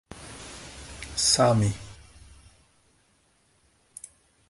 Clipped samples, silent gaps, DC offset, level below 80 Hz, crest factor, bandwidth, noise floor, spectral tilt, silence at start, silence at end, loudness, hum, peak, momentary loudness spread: under 0.1%; none; under 0.1%; -50 dBFS; 22 dB; 11.5 kHz; -66 dBFS; -3.5 dB/octave; 0.15 s; 2.55 s; -23 LUFS; none; -8 dBFS; 26 LU